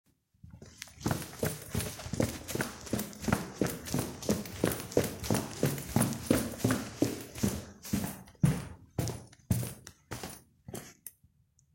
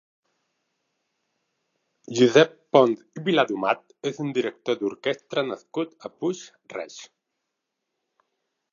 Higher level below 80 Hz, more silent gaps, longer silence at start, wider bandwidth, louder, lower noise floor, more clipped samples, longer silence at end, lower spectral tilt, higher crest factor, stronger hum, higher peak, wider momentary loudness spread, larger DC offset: first, -52 dBFS vs -78 dBFS; neither; second, 0.45 s vs 2.1 s; first, 16.5 kHz vs 7.4 kHz; second, -34 LUFS vs -24 LUFS; second, -67 dBFS vs -81 dBFS; neither; second, 0.65 s vs 1.7 s; about the same, -5 dB/octave vs -5 dB/octave; about the same, 24 dB vs 24 dB; neither; second, -10 dBFS vs -2 dBFS; about the same, 15 LU vs 17 LU; neither